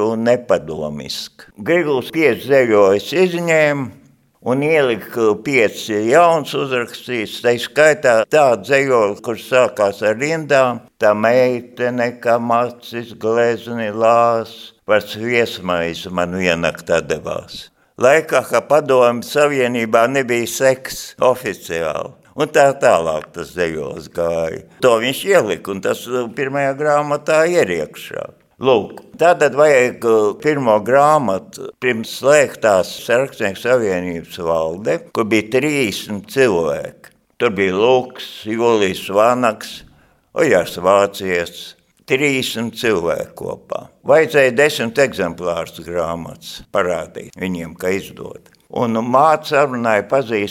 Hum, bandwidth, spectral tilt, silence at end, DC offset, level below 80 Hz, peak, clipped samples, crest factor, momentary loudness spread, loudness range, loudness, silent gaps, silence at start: none; 17 kHz; -4.5 dB/octave; 0 s; under 0.1%; -54 dBFS; 0 dBFS; under 0.1%; 16 dB; 13 LU; 4 LU; -16 LUFS; none; 0 s